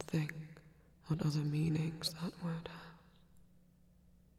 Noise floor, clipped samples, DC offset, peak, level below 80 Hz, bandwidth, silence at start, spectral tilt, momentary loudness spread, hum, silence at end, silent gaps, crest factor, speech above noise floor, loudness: -66 dBFS; under 0.1%; under 0.1%; -22 dBFS; -66 dBFS; 14.5 kHz; 0 s; -6 dB/octave; 19 LU; none; 1 s; none; 20 dB; 29 dB; -39 LUFS